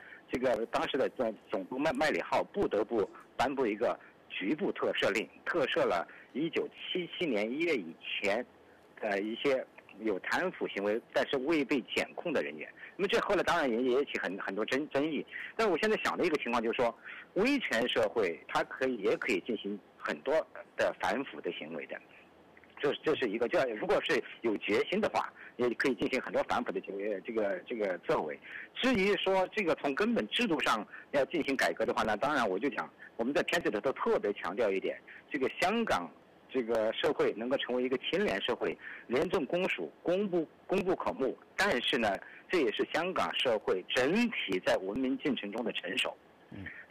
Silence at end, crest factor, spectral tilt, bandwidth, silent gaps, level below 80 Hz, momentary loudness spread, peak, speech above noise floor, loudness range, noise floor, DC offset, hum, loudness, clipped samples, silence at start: 0.05 s; 12 dB; -4.5 dB/octave; 15.5 kHz; none; -64 dBFS; 8 LU; -20 dBFS; 27 dB; 3 LU; -59 dBFS; under 0.1%; none; -32 LUFS; under 0.1%; 0 s